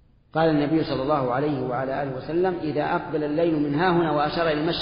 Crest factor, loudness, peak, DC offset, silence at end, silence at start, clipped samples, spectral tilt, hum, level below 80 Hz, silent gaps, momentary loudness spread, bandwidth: 14 dB; -24 LUFS; -8 dBFS; under 0.1%; 0 s; 0.35 s; under 0.1%; -5 dB/octave; none; -50 dBFS; none; 5 LU; 5.4 kHz